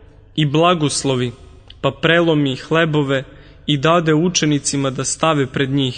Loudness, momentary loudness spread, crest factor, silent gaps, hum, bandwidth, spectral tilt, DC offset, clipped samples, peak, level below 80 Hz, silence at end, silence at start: -17 LUFS; 8 LU; 16 dB; none; none; 9.6 kHz; -4.5 dB/octave; under 0.1%; under 0.1%; 0 dBFS; -46 dBFS; 0 s; 0.35 s